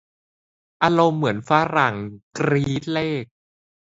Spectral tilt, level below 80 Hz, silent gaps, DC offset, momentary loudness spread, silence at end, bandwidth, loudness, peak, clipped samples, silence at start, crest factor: -6.5 dB/octave; -56 dBFS; 2.23-2.31 s; under 0.1%; 10 LU; 0.7 s; 8 kHz; -21 LUFS; 0 dBFS; under 0.1%; 0.8 s; 22 dB